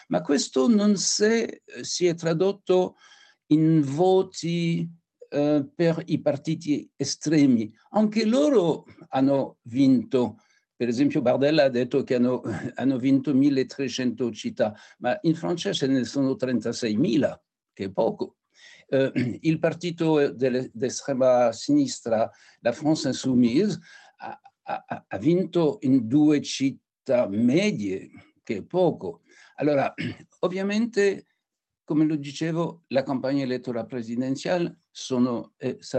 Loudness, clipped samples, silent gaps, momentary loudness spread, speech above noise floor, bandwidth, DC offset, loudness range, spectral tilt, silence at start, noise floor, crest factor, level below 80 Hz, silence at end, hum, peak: -24 LUFS; under 0.1%; none; 11 LU; 62 dB; 9 kHz; under 0.1%; 4 LU; -5.5 dB/octave; 0.1 s; -86 dBFS; 16 dB; -76 dBFS; 0 s; none; -8 dBFS